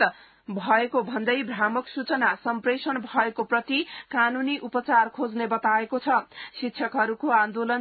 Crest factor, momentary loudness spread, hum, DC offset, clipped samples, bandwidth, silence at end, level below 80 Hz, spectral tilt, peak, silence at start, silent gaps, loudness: 18 dB; 7 LU; none; under 0.1%; under 0.1%; 4.8 kHz; 0 s; -72 dBFS; -8.5 dB/octave; -8 dBFS; 0 s; none; -25 LUFS